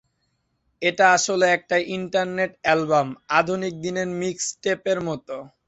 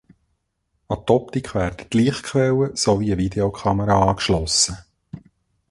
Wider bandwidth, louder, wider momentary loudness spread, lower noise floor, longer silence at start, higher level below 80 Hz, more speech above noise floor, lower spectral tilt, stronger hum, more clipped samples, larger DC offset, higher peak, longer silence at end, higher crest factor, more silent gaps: second, 8.2 kHz vs 11.5 kHz; about the same, -22 LUFS vs -20 LUFS; about the same, 9 LU vs 8 LU; about the same, -72 dBFS vs -72 dBFS; about the same, 0.8 s vs 0.9 s; second, -62 dBFS vs -40 dBFS; about the same, 49 dB vs 52 dB; about the same, -3.5 dB/octave vs -4.5 dB/octave; neither; neither; neither; about the same, -2 dBFS vs -2 dBFS; second, 0.2 s vs 0.5 s; about the same, 20 dB vs 18 dB; neither